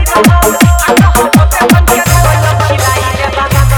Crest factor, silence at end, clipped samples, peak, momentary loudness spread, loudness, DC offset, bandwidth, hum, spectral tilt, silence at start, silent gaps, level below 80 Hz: 8 dB; 0 s; 2%; 0 dBFS; 4 LU; -8 LUFS; under 0.1%; over 20 kHz; none; -5 dB/octave; 0 s; none; -14 dBFS